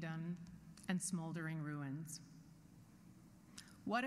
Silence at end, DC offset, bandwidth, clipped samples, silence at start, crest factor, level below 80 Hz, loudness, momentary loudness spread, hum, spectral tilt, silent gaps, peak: 0 s; under 0.1%; 15.5 kHz; under 0.1%; 0 s; 20 dB; -74 dBFS; -45 LUFS; 21 LU; none; -5 dB/octave; none; -26 dBFS